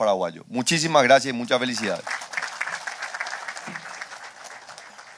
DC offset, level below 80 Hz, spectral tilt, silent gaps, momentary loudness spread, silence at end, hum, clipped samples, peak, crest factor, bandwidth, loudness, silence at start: under 0.1%; -72 dBFS; -3 dB/octave; none; 21 LU; 0 s; none; under 0.1%; -4 dBFS; 22 dB; 11 kHz; -23 LUFS; 0 s